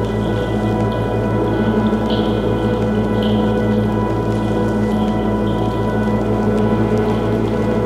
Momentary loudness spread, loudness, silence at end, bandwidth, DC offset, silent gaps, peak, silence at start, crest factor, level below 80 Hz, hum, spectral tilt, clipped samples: 2 LU; -17 LUFS; 0 s; 12 kHz; under 0.1%; none; -4 dBFS; 0 s; 12 dB; -30 dBFS; none; -8 dB/octave; under 0.1%